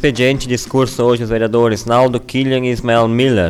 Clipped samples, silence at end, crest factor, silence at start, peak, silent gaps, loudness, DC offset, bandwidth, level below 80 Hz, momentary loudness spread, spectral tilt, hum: under 0.1%; 0 s; 10 dB; 0 s; -2 dBFS; none; -14 LUFS; under 0.1%; 14.5 kHz; -36 dBFS; 4 LU; -6 dB/octave; none